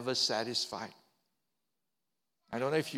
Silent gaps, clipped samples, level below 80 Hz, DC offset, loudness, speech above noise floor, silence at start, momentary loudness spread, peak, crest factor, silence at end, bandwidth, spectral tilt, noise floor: none; under 0.1%; -80 dBFS; under 0.1%; -34 LUFS; 54 dB; 0 s; 13 LU; -16 dBFS; 22 dB; 0 s; 16.5 kHz; -3 dB/octave; -88 dBFS